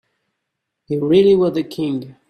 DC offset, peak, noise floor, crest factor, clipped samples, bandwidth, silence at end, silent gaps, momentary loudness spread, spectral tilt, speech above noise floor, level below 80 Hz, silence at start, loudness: under 0.1%; -2 dBFS; -78 dBFS; 16 dB; under 0.1%; 12.5 kHz; 0.2 s; none; 11 LU; -8 dB/octave; 61 dB; -56 dBFS; 0.9 s; -17 LUFS